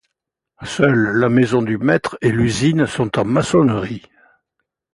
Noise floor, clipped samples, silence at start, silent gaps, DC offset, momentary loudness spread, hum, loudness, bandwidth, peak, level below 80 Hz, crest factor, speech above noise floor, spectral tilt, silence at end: -80 dBFS; under 0.1%; 0.6 s; none; under 0.1%; 11 LU; none; -16 LUFS; 11.5 kHz; -2 dBFS; -46 dBFS; 16 dB; 64 dB; -6.5 dB/octave; 0.95 s